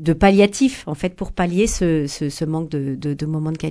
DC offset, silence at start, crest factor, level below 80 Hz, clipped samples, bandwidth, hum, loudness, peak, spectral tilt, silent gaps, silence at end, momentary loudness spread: under 0.1%; 0 s; 18 dB; -36 dBFS; under 0.1%; 11 kHz; none; -20 LUFS; -2 dBFS; -6 dB/octave; none; 0 s; 11 LU